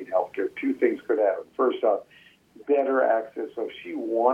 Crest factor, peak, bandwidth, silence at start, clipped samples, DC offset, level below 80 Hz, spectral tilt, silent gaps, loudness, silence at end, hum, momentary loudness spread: 18 dB; -6 dBFS; 5.8 kHz; 0 s; under 0.1%; under 0.1%; -74 dBFS; -6 dB/octave; none; -26 LUFS; 0 s; none; 11 LU